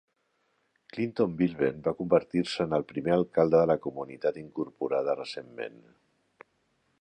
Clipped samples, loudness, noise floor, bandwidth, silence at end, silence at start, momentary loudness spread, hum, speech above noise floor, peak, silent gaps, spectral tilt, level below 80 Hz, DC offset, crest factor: under 0.1%; -29 LUFS; -74 dBFS; 9.6 kHz; 1.3 s; 0.95 s; 14 LU; none; 46 dB; -8 dBFS; none; -7 dB/octave; -62 dBFS; under 0.1%; 20 dB